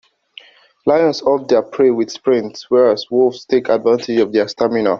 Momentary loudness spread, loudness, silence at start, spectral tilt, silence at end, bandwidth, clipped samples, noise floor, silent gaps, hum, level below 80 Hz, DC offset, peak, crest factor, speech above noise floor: 4 LU; -16 LUFS; 0.85 s; -5.5 dB/octave; 0 s; 7.4 kHz; under 0.1%; -43 dBFS; none; none; -58 dBFS; under 0.1%; -2 dBFS; 14 dB; 28 dB